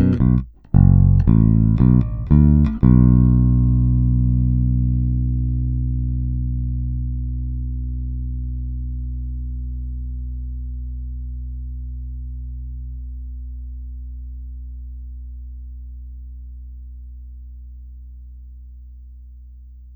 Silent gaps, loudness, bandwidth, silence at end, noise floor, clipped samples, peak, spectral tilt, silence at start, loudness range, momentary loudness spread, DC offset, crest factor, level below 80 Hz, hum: none; -19 LUFS; 2.6 kHz; 0 s; -40 dBFS; under 0.1%; 0 dBFS; -13 dB/octave; 0 s; 23 LU; 24 LU; under 0.1%; 18 dB; -24 dBFS; none